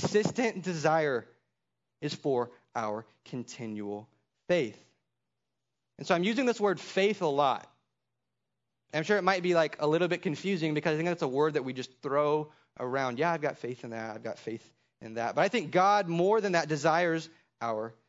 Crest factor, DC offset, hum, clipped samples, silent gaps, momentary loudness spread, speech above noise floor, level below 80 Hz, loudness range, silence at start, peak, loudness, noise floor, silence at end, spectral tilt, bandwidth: 20 dB; under 0.1%; none; under 0.1%; none; 13 LU; 57 dB; -80 dBFS; 7 LU; 0 s; -10 dBFS; -30 LUFS; -87 dBFS; 0.15 s; -5.5 dB/octave; 7.8 kHz